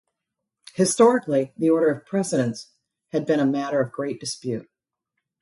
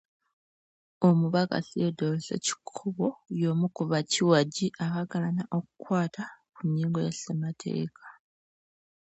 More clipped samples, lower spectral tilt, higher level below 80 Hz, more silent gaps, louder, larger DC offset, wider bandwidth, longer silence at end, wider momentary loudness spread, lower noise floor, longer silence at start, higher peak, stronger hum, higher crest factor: neither; about the same, -5 dB/octave vs -5.5 dB/octave; about the same, -70 dBFS vs -72 dBFS; neither; first, -23 LUFS vs -29 LUFS; neither; first, 11.5 kHz vs 8.2 kHz; second, 0.8 s vs 1 s; first, 13 LU vs 10 LU; second, -83 dBFS vs under -90 dBFS; second, 0.75 s vs 1 s; first, -4 dBFS vs -10 dBFS; neither; about the same, 18 dB vs 20 dB